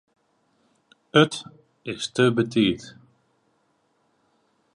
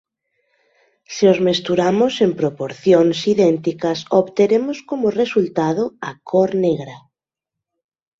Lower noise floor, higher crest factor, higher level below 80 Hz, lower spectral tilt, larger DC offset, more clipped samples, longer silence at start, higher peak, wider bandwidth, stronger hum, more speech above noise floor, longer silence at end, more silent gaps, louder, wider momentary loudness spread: second, -68 dBFS vs -85 dBFS; first, 22 dB vs 16 dB; about the same, -62 dBFS vs -60 dBFS; about the same, -5.5 dB/octave vs -6 dB/octave; neither; neither; about the same, 1.15 s vs 1.1 s; about the same, -4 dBFS vs -2 dBFS; first, 11 kHz vs 7.8 kHz; neither; second, 46 dB vs 68 dB; first, 1.85 s vs 1.2 s; neither; second, -23 LUFS vs -17 LUFS; first, 16 LU vs 9 LU